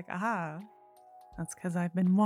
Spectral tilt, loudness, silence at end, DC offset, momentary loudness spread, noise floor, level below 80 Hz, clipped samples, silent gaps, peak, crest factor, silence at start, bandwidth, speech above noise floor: -7.5 dB/octave; -34 LUFS; 0 s; under 0.1%; 19 LU; -57 dBFS; -66 dBFS; under 0.1%; none; -18 dBFS; 14 dB; 0 s; 13 kHz; 26 dB